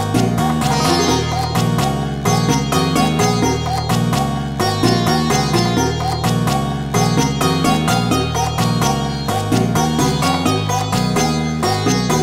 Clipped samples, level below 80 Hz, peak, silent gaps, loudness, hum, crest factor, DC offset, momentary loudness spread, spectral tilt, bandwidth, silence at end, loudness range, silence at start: under 0.1%; -34 dBFS; -2 dBFS; none; -16 LUFS; none; 16 dB; 0.5%; 4 LU; -5 dB/octave; 16.5 kHz; 0 s; 1 LU; 0 s